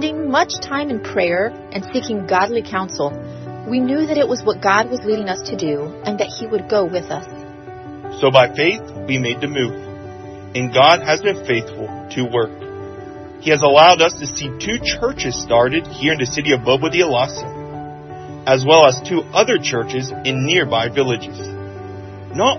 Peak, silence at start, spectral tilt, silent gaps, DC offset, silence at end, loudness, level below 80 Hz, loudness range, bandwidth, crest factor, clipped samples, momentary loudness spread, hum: 0 dBFS; 0 s; -4 dB/octave; none; under 0.1%; 0 s; -17 LUFS; -48 dBFS; 5 LU; 6.4 kHz; 18 dB; under 0.1%; 19 LU; none